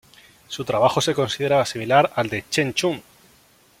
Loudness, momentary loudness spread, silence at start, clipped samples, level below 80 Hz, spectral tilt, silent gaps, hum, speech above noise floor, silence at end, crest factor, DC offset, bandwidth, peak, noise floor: -21 LUFS; 9 LU; 0.5 s; under 0.1%; -58 dBFS; -4 dB/octave; none; none; 35 dB; 0.8 s; 20 dB; under 0.1%; 16.5 kHz; -2 dBFS; -55 dBFS